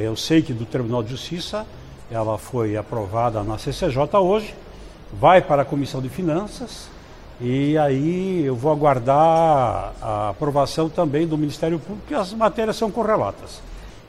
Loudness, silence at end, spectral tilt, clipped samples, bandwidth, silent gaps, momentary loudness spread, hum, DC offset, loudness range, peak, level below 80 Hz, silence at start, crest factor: -21 LUFS; 0 s; -6.5 dB/octave; under 0.1%; 14.5 kHz; none; 15 LU; none; under 0.1%; 5 LU; -2 dBFS; -42 dBFS; 0 s; 18 dB